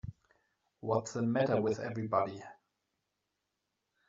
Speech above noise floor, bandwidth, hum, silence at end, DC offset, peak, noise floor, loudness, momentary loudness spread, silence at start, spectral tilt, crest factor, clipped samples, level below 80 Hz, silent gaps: 52 dB; 7.4 kHz; none; 1.55 s; under 0.1%; -16 dBFS; -85 dBFS; -33 LUFS; 19 LU; 0.05 s; -6.5 dB/octave; 20 dB; under 0.1%; -66 dBFS; none